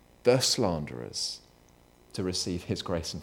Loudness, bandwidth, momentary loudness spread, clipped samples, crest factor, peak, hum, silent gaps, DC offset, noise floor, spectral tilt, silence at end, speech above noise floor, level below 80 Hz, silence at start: -29 LUFS; 19 kHz; 12 LU; under 0.1%; 22 dB; -10 dBFS; 60 Hz at -60 dBFS; none; under 0.1%; -59 dBFS; -4 dB/octave; 0 s; 30 dB; -54 dBFS; 0.25 s